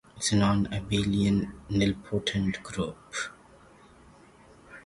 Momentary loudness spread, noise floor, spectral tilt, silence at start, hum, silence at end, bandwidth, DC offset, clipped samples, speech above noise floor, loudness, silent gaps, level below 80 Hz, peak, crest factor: 10 LU; -55 dBFS; -5 dB/octave; 0.15 s; none; 0.05 s; 11.5 kHz; under 0.1%; under 0.1%; 27 dB; -28 LUFS; none; -48 dBFS; -12 dBFS; 18 dB